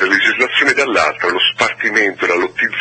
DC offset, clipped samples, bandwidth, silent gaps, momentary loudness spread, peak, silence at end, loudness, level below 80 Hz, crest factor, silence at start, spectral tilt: under 0.1%; under 0.1%; 8.8 kHz; none; 4 LU; 0 dBFS; 0 s; -13 LUFS; -54 dBFS; 14 dB; 0 s; -2 dB/octave